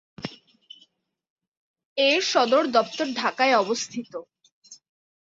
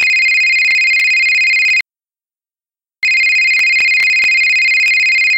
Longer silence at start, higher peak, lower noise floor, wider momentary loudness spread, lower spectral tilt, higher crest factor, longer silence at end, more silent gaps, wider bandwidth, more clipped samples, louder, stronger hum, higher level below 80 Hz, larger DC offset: first, 0.2 s vs 0 s; about the same, -6 dBFS vs -4 dBFS; second, -63 dBFS vs under -90 dBFS; first, 18 LU vs 3 LU; first, -2.5 dB/octave vs 4 dB/octave; first, 20 dB vs 8 dB; first, 0.55 s vs 0 s; first, 1.30-1.36 s, 1.48-1.74 s, 1.85-1.96 s, 4.52-4.62 s vs none; second, 7.8 kHz vs 17 kHz; neither; second, -22 LUFS vs -9 LUFS; neither; second, -72 dBFS vs -66 dBFS; neither